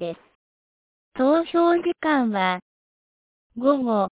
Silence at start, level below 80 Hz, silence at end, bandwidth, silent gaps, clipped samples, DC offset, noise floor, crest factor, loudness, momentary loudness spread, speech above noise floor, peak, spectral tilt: 0 s; -66 dBFS; 0.05 s; 4 kHz; 0.35-1.12 s, 2.62-3.50 s; under 0.1%; under 0.1%; under -90 dBFS; 16 dB; -22 LUFS; 16 LU; over 69 dB; -6 dBFS; -9.5 dB/octave